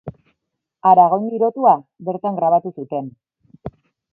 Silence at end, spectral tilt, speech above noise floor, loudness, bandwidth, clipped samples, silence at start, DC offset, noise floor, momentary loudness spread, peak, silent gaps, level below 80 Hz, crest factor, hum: 0.45 s; -10.5 dB/octave; 61 dB; -17 LUFS; 3.1 kHz; under 0.1%; 0.05 s; under 0.1%; -78 dBFS; 24 LU; 0 dBFS; none; -56 dBFS; 18 dB; none